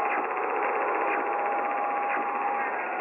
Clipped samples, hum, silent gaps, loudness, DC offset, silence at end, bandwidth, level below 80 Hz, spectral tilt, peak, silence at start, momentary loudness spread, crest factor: under 0.1%; none; none; -28 LUFS; under 0.1%; 0 s; 3.7 kHz; -82 dBFS; -6 dB/octave; -12 dBFS; 0 s; 2 LU; 16 dB